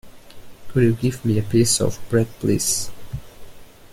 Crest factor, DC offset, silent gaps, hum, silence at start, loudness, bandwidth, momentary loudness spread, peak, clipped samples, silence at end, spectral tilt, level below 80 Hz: 16 dB; under 0.1%; none; none; 0.05 s; -20 LUFS; 16.5 kHz; 15 LU; -4 dBFS; under 0.1%; 0.05 s; -5 dB/octave; -44 dBFS